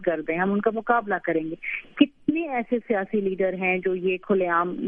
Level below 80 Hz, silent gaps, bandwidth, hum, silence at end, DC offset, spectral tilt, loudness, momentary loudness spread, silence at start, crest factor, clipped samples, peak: -60 dBFS; none; 3.7 kHz; none; 0 s; under 0.1%; -9.5 dB/octave; -25 LUFS; 5 LU; 0 s; 20 dB; under 0.1%; -4 dBFS